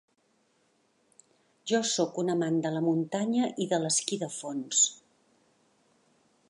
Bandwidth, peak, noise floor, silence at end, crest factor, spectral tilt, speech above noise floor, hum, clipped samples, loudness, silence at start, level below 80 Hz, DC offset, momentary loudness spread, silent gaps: 11.5 kHz; -12 dBFS; -70 dBFS; 1.55 s; 20 dB; -3.5 dB/octave; 42 dB; none; under 0.1%; -28 LUFS; 1.65 s; -82 dBFS; under 0.1%; 9 LU; none